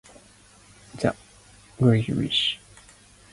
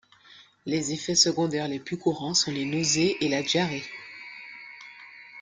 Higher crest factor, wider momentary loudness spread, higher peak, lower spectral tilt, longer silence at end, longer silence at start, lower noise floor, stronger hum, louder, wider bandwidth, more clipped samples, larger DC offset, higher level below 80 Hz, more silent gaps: about the same, 22 dB vs 22 dB; second, 18 LU vs 21 LU; about the same, -6 dBFS vs -6 dBFS; first, -6 dB/octave vs -3 dB/octave; first, 0.75 s vs 0 s; first, 0.95 s vs 0.3 s; about the same, -53 dBFS vs -54 dBFS; first, 50 Hz at -50 dBFS vs none; about the same, -24 LUFS vs -25 LUFS; about the same, 11.5 kHz vs 11 kHz; neither; neither; first, -54 dBFS vs -66 dBFS; neither